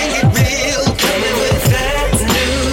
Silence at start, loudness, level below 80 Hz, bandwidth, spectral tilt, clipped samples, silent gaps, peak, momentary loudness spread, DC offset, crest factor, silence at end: 0 s; -14 LUFS; -24 dBFS; 17 kHz; -4 dB/octave; under 0.1%; none; -4 dBFS; 2 LU; under 0.1%; 10 dB; 0 s